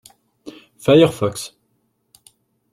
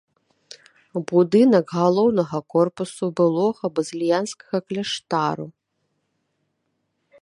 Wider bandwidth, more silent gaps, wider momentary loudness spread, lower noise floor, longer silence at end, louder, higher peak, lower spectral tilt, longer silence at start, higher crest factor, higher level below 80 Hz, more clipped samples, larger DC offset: first, 15 kHz vs 11 kHz; neither; first, 27 LU vs 11 LU; second, -67 dBFS vs -74 dBFS; second, 1.25 s vs 1.7 s; first, -16 LUFS vs -21 LUFS; about the same, -2 dBFS vs -4 dBFS; about the same, -6 dB/octave vs -6 dB/octave; second, 0.45 s vs 0.95 s; about the same, 18 dB vs 18 dB; first, -56 dBFS vs -68 dBFS; neither; neither